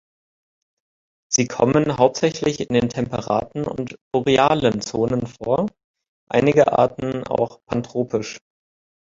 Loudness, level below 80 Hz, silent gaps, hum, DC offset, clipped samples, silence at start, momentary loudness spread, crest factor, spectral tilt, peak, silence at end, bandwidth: -20 LUFS; -50 dBFS; 4.01-4.11 s, 5.84-5.94 s, 6.08-6.27 s; none; under 0.1%; under 0.1%; 1.3 s; 11 LU; 20 dB; -5 dB/octave; -2 dBFS; 0.8 s; 7.8 kHz